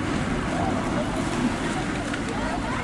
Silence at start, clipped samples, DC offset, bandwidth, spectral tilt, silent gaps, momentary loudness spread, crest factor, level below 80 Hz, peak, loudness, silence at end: 0 s; under 0.1%; under 0.1%; 11.5 kHz; -5.5 dB/octave; none; 2 LU; 12 dB; -38 dBFS; -12 dBFS; -26 LUFS; 0 s